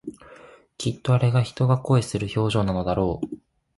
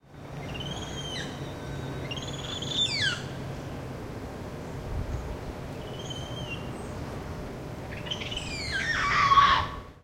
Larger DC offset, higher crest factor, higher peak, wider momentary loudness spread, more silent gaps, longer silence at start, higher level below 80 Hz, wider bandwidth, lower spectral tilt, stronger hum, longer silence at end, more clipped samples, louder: neither; second, 16 dB vs 24 dB; about the same, -8 dBFS vs -8 dBFS; second, 12 LU vs 15 LU; neither; about the same, 0.05 s vs 0.05 s; about the same, -46 dBFS vs -44 dBFS; second, 11.5 kHz vs 16 kHz; first, -7 dB/octave vs -3.5 dB/octave; neither; first, 0.4 s vs 0 s; neither; first, -23 LUFS vs -30 LUFS